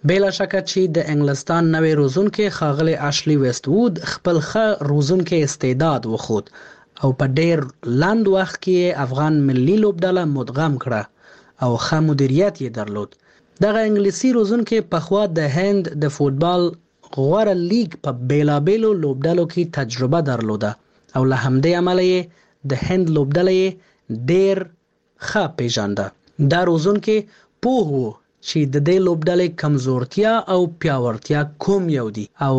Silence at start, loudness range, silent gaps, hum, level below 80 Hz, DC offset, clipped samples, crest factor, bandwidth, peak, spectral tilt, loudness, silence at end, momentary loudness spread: 0.05 s; 2 LU; none; none; -52 dBFS; under 0.1%; under 0.1%; 14 dB; 8.6 kHz; -4 dBFS; -6.5 dB/octave; -19 LUFS; 0 s; 8 LU